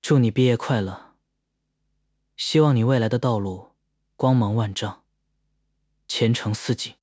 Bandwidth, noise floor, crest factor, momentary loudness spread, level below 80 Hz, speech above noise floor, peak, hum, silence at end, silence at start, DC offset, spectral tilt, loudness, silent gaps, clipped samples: 8 kHz; -76 dBFS; 18 dB; 13 LU; -54 dBFS; 55 dB; -6 dBFS; 50 Hz at -45 dBFS; 0.1 s; 0.05 s; under 0.1%; -6.5 dB/octave; -22 LUFS; none; under 0.1%